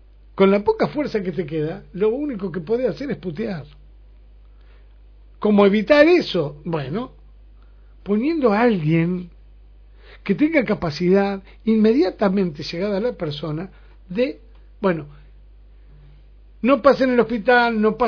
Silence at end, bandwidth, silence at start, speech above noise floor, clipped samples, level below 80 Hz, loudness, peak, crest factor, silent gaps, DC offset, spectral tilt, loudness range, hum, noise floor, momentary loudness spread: 0 s; 5.4 kHz; 0.4 s; 27 dB; under 0.1%; -46 dBFS; -20 LUFS; 0 dBFS; 20 dB; none; under 0.1%; -8 dB/octave; 7 LU; 50 Hz at -45 dBFS; -46 dBFS; 13 LU